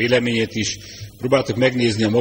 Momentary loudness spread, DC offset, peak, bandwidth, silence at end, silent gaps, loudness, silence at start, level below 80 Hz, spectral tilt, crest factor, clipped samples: 12 LU; under 0.1%; -2 dBFS; 16 kHz; 0 s; none; -19 LUFS; 0 s; -50 dBFS; -5 dB/octave; 16 dB; under 0.1%